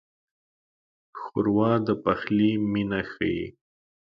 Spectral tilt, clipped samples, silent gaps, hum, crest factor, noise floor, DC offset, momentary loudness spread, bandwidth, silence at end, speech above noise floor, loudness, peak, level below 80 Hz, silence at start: -9.5 dB/octave; under 0.1%; none; none; 18 dB; under -90 dBFS; under 0.1%; 12 LU; 5.6 kHz; 0.65 s; over 66 dB; -25 LUFS; -8 dBFS; -56 dBFS; 1.15 s